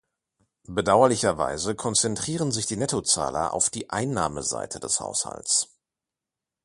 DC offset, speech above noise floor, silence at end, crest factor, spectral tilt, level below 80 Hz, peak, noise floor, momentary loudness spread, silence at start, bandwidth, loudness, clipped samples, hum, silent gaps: under 0.1%; 63 dB; 1 s; 22 dB; -3 dB/octave; -54 dBFS; -4 dBFS; -88 dBFS; 9 LU; 0.7 s; 11.5 kHz; -24 LUFS; under 0.1%; none; none